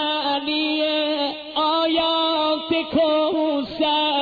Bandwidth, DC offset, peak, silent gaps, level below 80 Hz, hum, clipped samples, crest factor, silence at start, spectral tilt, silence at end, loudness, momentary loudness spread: 4.9 kHz; under 0.1%; -10 dBFS; none; -56 dBFS; none; under 0.1%; 12 dB; 0 s; -5.5 dB/octave; 0 s; -21 LUFS; 4 LU